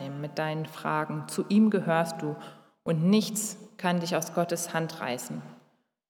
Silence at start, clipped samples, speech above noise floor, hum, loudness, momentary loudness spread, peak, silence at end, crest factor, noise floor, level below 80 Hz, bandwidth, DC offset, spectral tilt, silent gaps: 0 s; under 0.1%; 39 dB; none; -29 LUFS; 12 LU; -10 dBFS; 0.55 s; 18 dB; -67 dBFS; -82 dBFS; 18.5 kHz; under 0.1%; -5 dB/octave; none